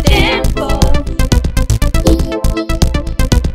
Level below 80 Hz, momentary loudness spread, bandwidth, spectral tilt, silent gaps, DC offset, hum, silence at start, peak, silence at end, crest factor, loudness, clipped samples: -14 dBFS; 5 LU; 16 kHz; -5 dB/octave; none; under 0.1%; none; 0 s; 0 dBFS; 0 s; 12 dB; -14 LUFS; 0.4%